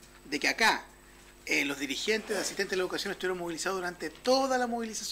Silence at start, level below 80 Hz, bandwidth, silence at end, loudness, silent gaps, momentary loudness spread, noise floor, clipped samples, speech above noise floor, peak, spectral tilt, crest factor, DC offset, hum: 0 s; -60 dBFS; 16 kHz; 0 s; -30 LUFS; none; 8 LU; -54 dBFS; under 0.1%; 24 dB; -14 dBFS; -2 dB/octave; 16 dB; under 0.1%; none